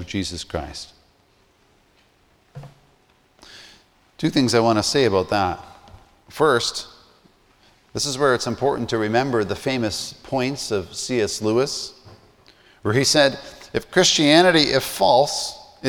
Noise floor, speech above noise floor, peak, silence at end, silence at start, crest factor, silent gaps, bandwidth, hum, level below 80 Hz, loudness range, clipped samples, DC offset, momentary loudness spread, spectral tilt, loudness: -59 dBFS; 39 dB; -2 dBFS; 0 s; 0 s; 20 dB; none; 20 kHz; none; -50 dBFS; 7 LU; under 0.1%; under 0.1%; 15 LU; -3.5 dB/octave; -20 LUFS